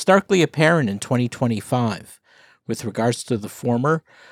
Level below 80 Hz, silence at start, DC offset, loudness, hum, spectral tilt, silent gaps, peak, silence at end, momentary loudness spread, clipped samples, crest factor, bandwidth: -66 dBFS; 0 s; under 0.1%; -21 LUFS; none; -5.5 dB/octave; none; -2 dBFS; 0.3 s; 11 LU; under 0.1%; 18 dB; 15.5 kHz